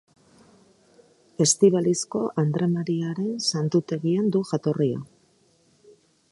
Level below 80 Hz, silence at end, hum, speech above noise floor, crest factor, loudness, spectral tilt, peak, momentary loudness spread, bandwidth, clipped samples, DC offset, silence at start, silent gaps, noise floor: -68 dBFS; 1.25 s; none; 39 dB; 20 dB; -23 LUFS; -5.5 dB/octave; -6 dBFS; 8 LU; 11.5 kHz; under 0.1%; under 0.1%; 1.4 s; none; -62 dBFS